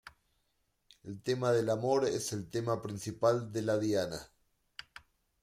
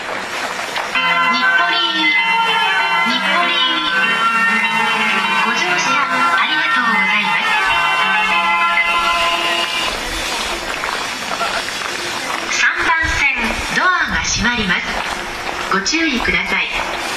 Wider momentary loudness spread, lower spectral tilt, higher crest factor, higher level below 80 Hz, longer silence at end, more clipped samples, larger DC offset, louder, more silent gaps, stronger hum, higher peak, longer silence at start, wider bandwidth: first, 19 LU vs 7 LU; first, -5.5 dB/octave vs -1.5 dB/octave; about the same, 18 dB vs 14 dB; second, -68 dBFS vs -38 dBFS; first, 1.2 s vs 0 s; neither; neither; second, -33 LUFS vs -15 LUFS; neither; neither; second, -16 dBFS vs -2 dBFS; about the same, 0.05 s vs 0 s; first, 16 kHz vs 14 kHz